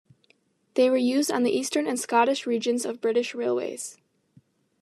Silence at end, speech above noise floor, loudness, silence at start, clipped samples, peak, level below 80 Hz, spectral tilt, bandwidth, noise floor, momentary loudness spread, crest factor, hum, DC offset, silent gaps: 0.9 s; 41 dB; -25 LUFS; 0.75 s; under 0.1%; -8 dBFS; -86 dBFS; -3 dB/octave; 13.5 kHz; -66 dBFS; 8 LU; 18 dB; none; under 0.1%; none